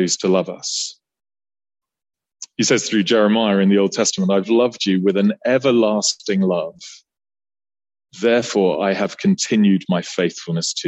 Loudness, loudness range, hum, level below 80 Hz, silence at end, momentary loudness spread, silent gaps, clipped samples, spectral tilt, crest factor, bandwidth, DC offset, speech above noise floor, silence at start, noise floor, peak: -18 LUFS; 4 LU; none; -66 dBFS; 0 s; 8 LU; none; under 0.1%; -4.5 dB/octave; 16 dB; 8.4 kHz; under 0.1%; over 73 dB; 0 s; under -90 dBFS; -4 dBFS